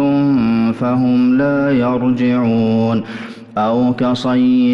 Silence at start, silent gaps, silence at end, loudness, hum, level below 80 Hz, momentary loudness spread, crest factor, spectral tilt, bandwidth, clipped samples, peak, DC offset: 0 s; none; 0 s; -15 LUFS; none; -48 dBFS; 6 LU; 8 dB; -8 dB/octave; 6.8 kHz; under 0.1%; -6 dBFS; under 0.1%